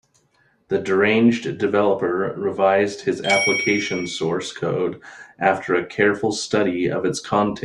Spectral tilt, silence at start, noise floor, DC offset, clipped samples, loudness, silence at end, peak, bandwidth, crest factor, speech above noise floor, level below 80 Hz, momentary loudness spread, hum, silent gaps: -4.5 dB/octave; 0.7 s; -62 dBFS; under 0.1%; under 0.1%; -20 LUFS; 0 s; -2 dBFS; 11 kHz; 18 dB; 41 dB; -60 dBFS; 7 LU; none; none